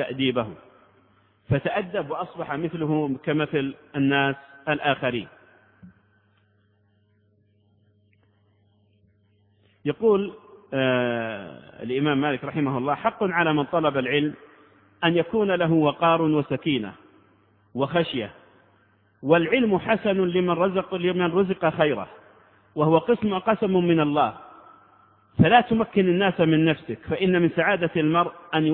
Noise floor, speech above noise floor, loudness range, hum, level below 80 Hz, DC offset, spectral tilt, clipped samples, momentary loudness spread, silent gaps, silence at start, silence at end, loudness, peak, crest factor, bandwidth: -64 dBFS; 42 dB; 6 LU; none; -58 dBFS; under 0.1%; -10.5 dB/octave; under 0.1%; 11 LU; none; 0 s; 0 s; -23 LUFS; -4 dBFS; 20 dB; 4.2 kHz